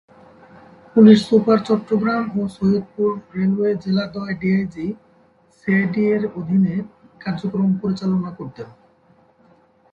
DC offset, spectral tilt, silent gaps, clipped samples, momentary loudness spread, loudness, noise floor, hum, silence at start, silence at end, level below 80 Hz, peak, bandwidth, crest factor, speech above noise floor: under 0.1%; -8 dB/octave; none; under 0.1%; 17 LU; -19 LUFS; -55 dBFS; none; 0.95 s; 1.25 s; -56 dBFS; 0 dBFS; 7.8 kHz; 20 dB; 37 dB